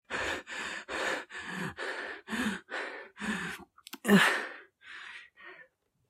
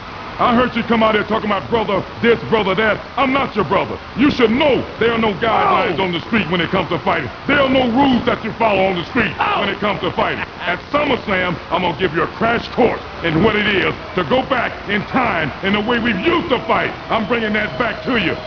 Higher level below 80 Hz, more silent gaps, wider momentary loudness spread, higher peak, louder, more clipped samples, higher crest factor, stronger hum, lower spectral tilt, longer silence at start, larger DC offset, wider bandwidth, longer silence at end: second, -66 dBFS vs -40 dBFS; neither; first, 23 LU vs 5 LU; second, -10 dBFS vs -2 dBFS; second, -32 LUFS vs -17 LUFS; neither; first, 24 dB vs 16 dB; neither; second, -4 dB/octave vs -7 dB/octave; about the same, 0.1 s vs 0 s; second, under 0.1% vs 0.2%; first, 16 kHz vs 5.4 kHz; first, 0.45 s vs 0 s